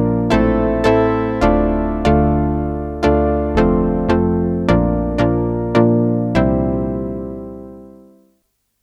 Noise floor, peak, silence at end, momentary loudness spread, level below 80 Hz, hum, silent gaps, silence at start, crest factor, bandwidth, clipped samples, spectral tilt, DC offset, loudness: -66 dBFS; 0 dBFS; 0.95 s; 9 LU; -26 dBFS; none; none; 0 s; 16 dB; 9.6 kHz; under 0.1%; -8.5 dB/octave; under 0.1%; -16 LUFS